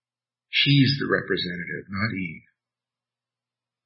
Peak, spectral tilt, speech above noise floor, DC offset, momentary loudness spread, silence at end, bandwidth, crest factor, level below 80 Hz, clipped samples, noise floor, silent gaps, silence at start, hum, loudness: -6 dBFS; -9.5 dB/octave; over 66 dB; under 0.1%; 14 LU; 1.45 s; 5.8 kHz; 20 dB; -62 dBFS; under 0.1%; under -90 dBFS; none; 0.5 s; none; -23 LUFS